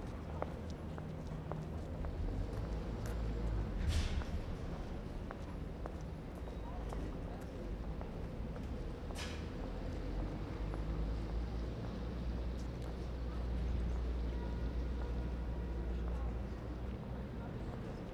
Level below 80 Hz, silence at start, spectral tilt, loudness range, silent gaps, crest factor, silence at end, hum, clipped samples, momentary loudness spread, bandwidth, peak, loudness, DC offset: -42 dBFS; 0 s; -7 dB/octave; 4 LU; none; 18 dB; 0 s; none; under 0.1%; 6 LU; 12 kHz; -22 dBFS; -43 LUFS; under 0.1%